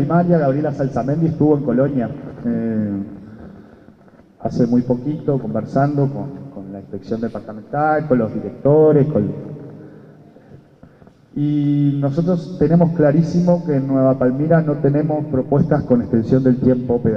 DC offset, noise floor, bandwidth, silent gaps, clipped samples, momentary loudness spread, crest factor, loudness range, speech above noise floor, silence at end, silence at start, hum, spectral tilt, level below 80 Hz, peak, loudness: under 0.1%; -47 dBFS; 6.6 kHz; none; under 0.1%; 15 LU; 16 dB; 6 LU; 31 dB; 0 s; 0 s; none; -10.5 dB/octave; -48 dBFS; -2 dBFS; -17 LUFS